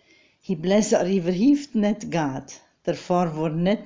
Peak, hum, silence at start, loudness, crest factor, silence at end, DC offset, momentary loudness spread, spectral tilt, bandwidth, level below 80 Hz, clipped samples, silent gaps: -8 dBFS; none; 0.5 s; -23 LUFS; 14 dB; 0 s; under 0.1%; 12 LU; -6 dB/octave; 7.6 kHz; -56 dBFS; under 0.1%; none